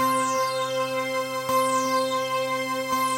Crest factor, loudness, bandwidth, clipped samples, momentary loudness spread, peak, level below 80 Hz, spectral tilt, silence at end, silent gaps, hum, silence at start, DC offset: 14 dB; -25 LUFS; 16 kHz; under 0.1%; 4 LU; -12 dBFS; -68 dBFS; -2.5 dB/octave; 0 s; none; none; 0 s; under 0.1%